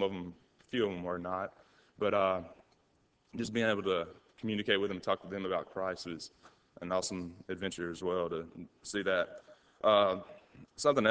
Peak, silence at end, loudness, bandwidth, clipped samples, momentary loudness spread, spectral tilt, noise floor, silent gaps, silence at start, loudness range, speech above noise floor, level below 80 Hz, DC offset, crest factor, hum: -12 dBFS; 0 s; -34 LUFS; 8 kHz; under 0.1%; 17 LU; -4.5 dB/octave; -72 dBFS; none; 0 s; 4 LU; 38 dB; -66 dBFS; under 0.1%; 22 dB; none